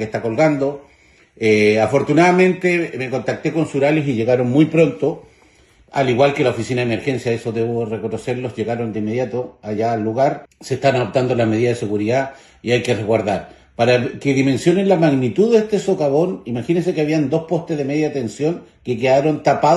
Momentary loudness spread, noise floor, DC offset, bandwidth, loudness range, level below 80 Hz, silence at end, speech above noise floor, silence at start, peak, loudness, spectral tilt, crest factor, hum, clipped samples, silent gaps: 9 LU; -51 dBFS; under 0.1%; 12 kHz; 5 LU; -54 dBFS; 0 s; 34 dB; 0 s; -2 dBFS; -18 LUFS; -6.5 dB/octave; 16 dB; none; under 0.1%; none